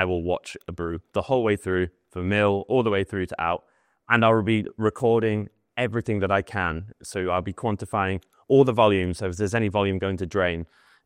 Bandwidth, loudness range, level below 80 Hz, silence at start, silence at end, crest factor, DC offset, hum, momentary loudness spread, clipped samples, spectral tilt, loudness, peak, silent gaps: 12.5 kHz; 2 LU; -54 dBFS; 0 s; 0.4 s; 22 dB; under 0.1%; none; 12 LU; under 0.1%; -6.5 dB/octave; -24 LUFS; -2 dBFS; none